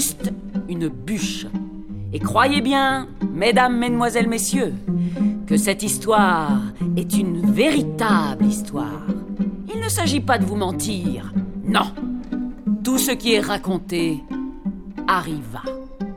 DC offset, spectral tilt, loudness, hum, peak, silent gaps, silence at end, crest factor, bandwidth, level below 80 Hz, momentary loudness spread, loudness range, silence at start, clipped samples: under 0.1%; -4.5 dB/octave; -21 LUFS; none; -2 dBFS; none; 0 s; 18 dB; 17.5 kHz; -42 dBFS; 12 LU; 3 LU; 0 s; under 0.1%